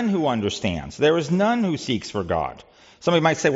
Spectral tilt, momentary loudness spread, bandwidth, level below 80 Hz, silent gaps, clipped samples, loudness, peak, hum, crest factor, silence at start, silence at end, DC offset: -4.5 dB/octave; 7 LU; 8 kHz; -52 dBFS; none; under 0.1%; -22 LUFS; -6 dBFS; none; 16 dB; 0 s; 0 s; under 0.1%